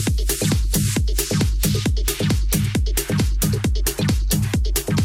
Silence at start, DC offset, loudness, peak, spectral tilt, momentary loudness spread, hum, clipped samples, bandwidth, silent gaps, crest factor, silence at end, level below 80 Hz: 0 s; under 0.1%; -21 LUFS; -6 dBFS; -4.5 dB/octave; 2 LU; none; under 0.1%; 17 kHz; none; 14 dB; 0 s; -22 dBFS